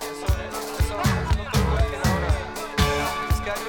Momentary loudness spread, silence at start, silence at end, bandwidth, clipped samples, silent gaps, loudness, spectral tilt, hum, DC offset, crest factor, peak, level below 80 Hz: 5 LU; 0 s; 0 s; 19.5 kHz; under 0.1%; none; -24 LUFS; -5 dB/octave; none; under 0.1%; 16 dB; -6 dBFS; -28 dBFS